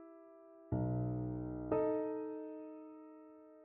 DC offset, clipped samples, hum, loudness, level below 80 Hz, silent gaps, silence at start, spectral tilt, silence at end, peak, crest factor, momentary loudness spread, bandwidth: under 0.1%; under 0.1%; none; -40 LUFS; -58 dBFS; none; 0 s; -11.5 dB/octave; 0 s; -22 dBFS; 18 dB; 22 LU; 2.8 kHz